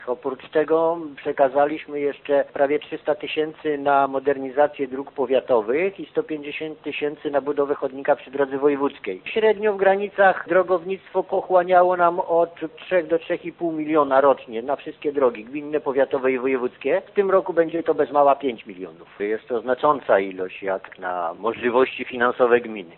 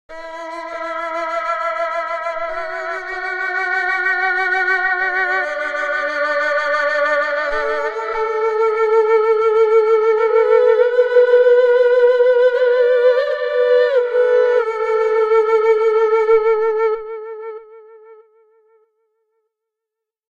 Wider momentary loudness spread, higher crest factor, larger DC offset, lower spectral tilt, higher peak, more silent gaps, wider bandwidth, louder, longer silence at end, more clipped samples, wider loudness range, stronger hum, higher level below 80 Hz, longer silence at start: about the same, 10 LU vs 11 LU; about the same, 18 dB vs 14 dB; second, under 0.1% vs 0.2%; first, -10 dB/octave vs -2 dB/octave; about the same, -4 dBFS vs -2 dBFS; neither; second, 4.3 kHz vs 7.2 kHz; second, -22 LUFS vs -16 LUFS; second, 0.1 s vs 2.15 s; neither; second, 4 LU vs 8 LU; neither; second, -66 dBFS vs -54 dBFS; about the same, 0 s vs 0.1 s